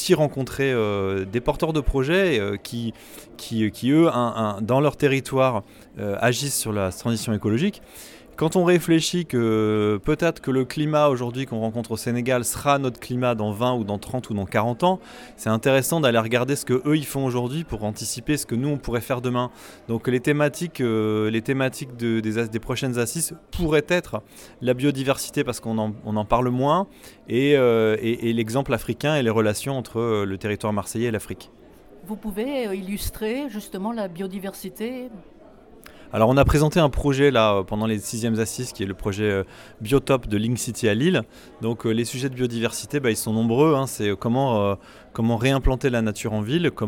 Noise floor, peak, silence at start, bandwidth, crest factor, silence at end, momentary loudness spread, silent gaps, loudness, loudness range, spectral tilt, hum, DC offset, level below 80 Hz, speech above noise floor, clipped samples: -48 dBFS; -4 dBFS; 0 s; 18.5 kHz; 18 dB; 0 s; 11 LU; none; -23 LUFS; 4 LU; -5.5 dB/octave; none; under 0.1%; -40 dBFS; 25 dB; under 0.1%